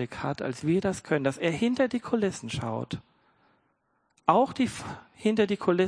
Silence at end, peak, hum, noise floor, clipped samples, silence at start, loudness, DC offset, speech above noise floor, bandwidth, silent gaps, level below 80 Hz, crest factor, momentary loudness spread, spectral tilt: 0 s; -6 dBFS; none; -73 dBFS; under 0.1%; 0 s; -28 LUFS; under 0.1%; 46 dB; 10.5 kHz; none; -60 dBFS; 22 dB; 10 LU; -6 dB/octave